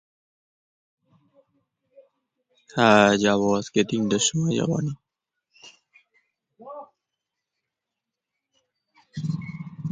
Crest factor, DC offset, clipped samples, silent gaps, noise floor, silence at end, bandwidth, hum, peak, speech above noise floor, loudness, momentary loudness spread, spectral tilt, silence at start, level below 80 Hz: 24 dB; under 0.1%; under 0.1%; none; -86 dBFS; 0 s; 9.6 kHz; none; -4 dBFS; 65 dB; -22 LUFS; 25 LU; -4.5 dB/octave; 2.75 s; -62 dBFS